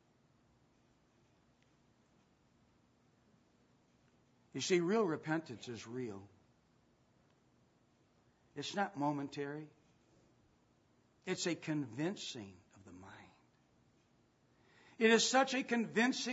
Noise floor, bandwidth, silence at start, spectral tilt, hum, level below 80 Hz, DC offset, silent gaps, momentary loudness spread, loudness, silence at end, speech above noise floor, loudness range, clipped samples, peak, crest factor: -73 dBFS; 7.6 kHz; 4.55 s; -3 dB/octave; none; -84 dBFS; under 0.1%; none; 21 LU; -36 LUFS; 0 s; 36 dB; 11 LU; under 0.1%; -16 dBFS; 24 dB